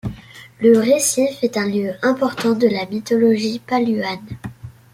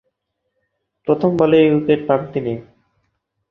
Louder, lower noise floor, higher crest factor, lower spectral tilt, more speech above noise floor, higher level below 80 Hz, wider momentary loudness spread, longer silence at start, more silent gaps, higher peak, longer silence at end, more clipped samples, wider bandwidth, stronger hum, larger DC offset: about the same, -18 LUFS vs -16 LUFS; second, -39 dBFS vs -74 dBFS; about the same, 16 dB vs 18 dB; second, -4.5 dB/octave vs -9 dB/octave; second, 22 dB vs 58 dB; about the same, -52 dBFS vs -56 dBFS; about the same, 16 LU vs 14 LU; second, 0.05 s vs 1.05 s; neither; about the same, -2 dBFS vs -2 dBFS; second, 0.2 s vs 0.85 s; neither; first, 16 kHz vs 5.6 kHz; neither; neither